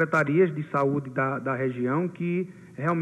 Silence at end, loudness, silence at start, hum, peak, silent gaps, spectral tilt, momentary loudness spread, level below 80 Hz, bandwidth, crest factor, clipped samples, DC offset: 0 s; -26 LUFS; 0 s; none; -10 dBFS; none; -8.5 dB/octave; 7 LU; -70 dBFS; 9.8 kHz; 14 dB; under 0.1%; under 0.1%